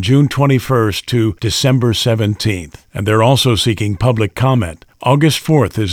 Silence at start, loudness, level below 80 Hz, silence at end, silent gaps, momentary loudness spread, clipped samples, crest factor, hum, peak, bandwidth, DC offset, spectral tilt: 0 s; -14 LUFS; -40 dBFS; 0 s; none; 7 LU; under 0.1%; 14 dB; none; 0 dBFS; 17 kHz; under 0.1%; -5.5 dB/octave